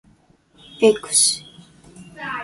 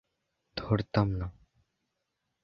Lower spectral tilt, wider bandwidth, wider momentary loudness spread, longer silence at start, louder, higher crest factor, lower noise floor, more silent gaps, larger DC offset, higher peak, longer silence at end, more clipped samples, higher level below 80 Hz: second, -1.5 dB/octave vs -9 dB/octave; first, 12 kHz vs 6 kHz; about the same, 14 LU vs 13 LU; first, 0.8 s vs 0.55 s; first, -17 LUFS vs -31 LUFS; about the same, 20 dB vs 24 dB; second, -56 dBFS vs -82 dBFS; neither; neither; first, -2 dBFS vs -10 dBFS; second, 0 s vs 1.1 s; neither; second, -60 dBFS vs -50 dBFS